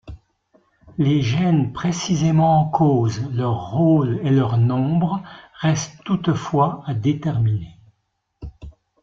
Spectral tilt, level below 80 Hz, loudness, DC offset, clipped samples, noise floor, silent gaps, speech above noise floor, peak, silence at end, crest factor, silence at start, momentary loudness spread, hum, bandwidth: -7 dB/octave; -48 dBFS; -20 LUFS; under 0.1%; under 0.1%; -72 dBFS; none; 53 dB; -4 dBFS; 0.3 s; 16 dB; 0.05 s; 12 LU; none; 7.6 kHz